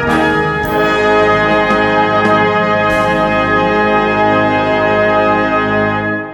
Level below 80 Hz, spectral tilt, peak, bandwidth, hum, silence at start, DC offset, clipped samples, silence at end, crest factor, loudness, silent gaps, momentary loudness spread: -36 dBFS; -6 dB/octave; 0 dBFS; 17 kHz; none; 0 s; under 0.1%; under 0.1%; 0 s; 12 dB; -12 LUFS; none; 3 LU